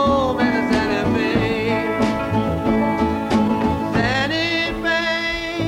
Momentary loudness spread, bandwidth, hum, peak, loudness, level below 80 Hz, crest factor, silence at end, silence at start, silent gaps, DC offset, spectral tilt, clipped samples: 2 LU; 16 kHz; none; -6 dBFS; -19 LUFS; -38 dBFS; 14 dB; 0 s; 0 s; none; under 0.1%; -6 dB/octave; under 0.1%